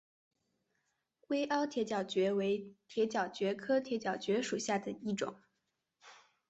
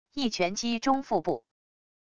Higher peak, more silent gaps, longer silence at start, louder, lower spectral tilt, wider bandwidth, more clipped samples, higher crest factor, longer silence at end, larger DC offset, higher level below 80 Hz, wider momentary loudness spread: second, -20 dBFS vs -12 dBFS; neither; first, 1.3 s vs 0.05 s; second, -36 LUFS vs -29 LUFS; about the same, -4.5 dB/octave vs -4 dB/octave; second, 8.2 kHz vs 10 kHz; neither; about the same, 16 dB vs 18 dB; second, 0.35 s vs 0.65 s; neither; second, -80 dBFS vs -62 dBFS; about the same, 6 LU vs 6 LU